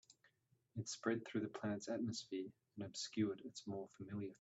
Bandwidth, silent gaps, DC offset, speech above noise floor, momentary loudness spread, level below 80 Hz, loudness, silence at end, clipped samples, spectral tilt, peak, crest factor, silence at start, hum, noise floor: 8.2 kHz; none; under 0.1%; 34 dB; 9 LU; -84 dBFS; -46 LUFS; 0.05 s; under 0.1%; -5 dB/octave; -26 dBFS; 20 dB; 0.1 s; none; -79 dBFS